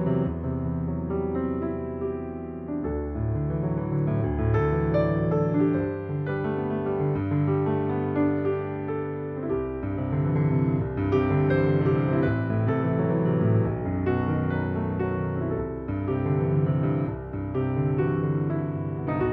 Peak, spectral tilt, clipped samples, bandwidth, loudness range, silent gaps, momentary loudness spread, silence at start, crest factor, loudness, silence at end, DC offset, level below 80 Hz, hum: -12 dBFS; -11.5 dB/octave; under 0.1%; 4.5 kHz; 4 LU; none; 7 LU; 0 s; 14 dB; -26 LUFS; 0 s; under 0.1%; -42 dBFS; none